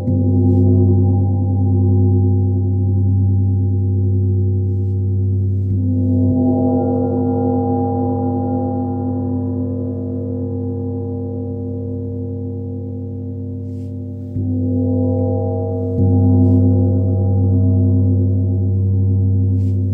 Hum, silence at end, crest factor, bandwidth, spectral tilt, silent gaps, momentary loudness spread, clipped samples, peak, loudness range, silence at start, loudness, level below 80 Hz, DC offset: none; 0 s; 12 dB; 1.1 kHz; -14.5 dB/octave; none; 11 LU; under 0.1%; -4 dBFS; 9 LU; 0 s; -17 LUFS; -50 dBFS; under 0.1%